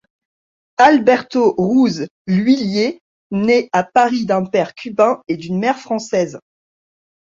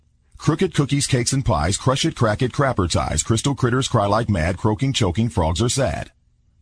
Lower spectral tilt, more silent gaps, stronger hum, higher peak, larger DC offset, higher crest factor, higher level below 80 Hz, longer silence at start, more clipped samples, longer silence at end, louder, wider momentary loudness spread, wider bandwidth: about the same, -6 dB/octave vs -5 dB/octave; first, 2.11-2.25 s, 3.01-3.30 s vs none; neither; first, 0 dBFS vs -4 dBFS; neither; about the same, 16 dB vs 16 dB; second, -58 dBFS vs -36 dBFS; first, 0.8 s vs 0.4 s; neither; first, 0.9 s vs 0.55 s; first, -16 LUFS vs -20 LUFS; first, 9 LU vs 3 LU; second, 7.6 kHz vs 10.5 kHz